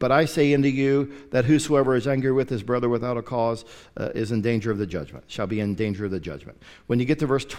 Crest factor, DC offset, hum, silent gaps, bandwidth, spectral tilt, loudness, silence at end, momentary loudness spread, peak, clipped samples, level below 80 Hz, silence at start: 18 dB; under 0.1%; none; none; 14.5 kHz; -6.5 dB/octave; -24 LUFS; 0 s; 13 LU; -6 dBFS; under 0.1%; -50 dBFS; 0 s